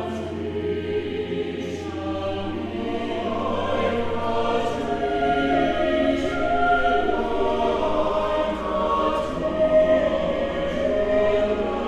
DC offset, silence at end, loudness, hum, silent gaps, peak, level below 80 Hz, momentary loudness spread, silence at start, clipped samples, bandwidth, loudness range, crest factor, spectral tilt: under 0.1%; 0 s; -23 LUFS; none; none; -8 dBFS; -40 dBFS; 8 LU; 0 s; under 0.1%; 10.5 kHz; 5 LU; 14 dB; -6.5 dB/octave